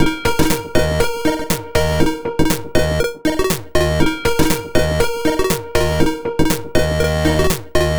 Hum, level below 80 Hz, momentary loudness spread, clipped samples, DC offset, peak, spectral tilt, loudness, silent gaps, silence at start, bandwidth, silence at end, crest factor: none; -26 dBFS; 3 LU; under 0.1%; 1%; -2 dBFS; -5 dB/octave; -18 LUFS; none; 0 s; over 20 kHz; 0 s; 14 dB